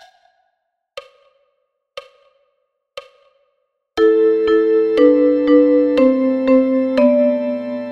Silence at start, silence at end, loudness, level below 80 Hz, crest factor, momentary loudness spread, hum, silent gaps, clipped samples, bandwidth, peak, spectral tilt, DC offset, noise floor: 0.95 s; 0 s; -14 LUFS; -56 dBFS; 16 dB; 25 LU; none; none; under 0.1%; 6.6 kHz; -2 dBFS; -6.5 dB/octave; under 0.1%; -71 dBFS